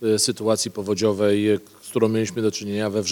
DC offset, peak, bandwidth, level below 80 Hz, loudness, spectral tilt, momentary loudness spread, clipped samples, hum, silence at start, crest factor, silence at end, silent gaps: under 0.1%; -6 dBFS; 18.5 kHz; -66 dBFS; -22 LUFS; -4.5 dB/octave; 5 LU; under 0.1%; none; 0 s; 16 dB; 0 s; none